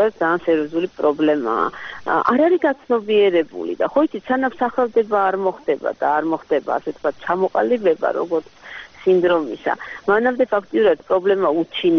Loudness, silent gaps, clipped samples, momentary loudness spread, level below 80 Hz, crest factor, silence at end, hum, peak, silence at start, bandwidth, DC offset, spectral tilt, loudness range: -19 LUFS; none; under 0.1%; 8 LU; -58 dBFS; 16 dB; 0 s; none; -2 dBFS; 0 s; 6.6 kHz; 0.1%; -3.5 dB/octave; 2 LU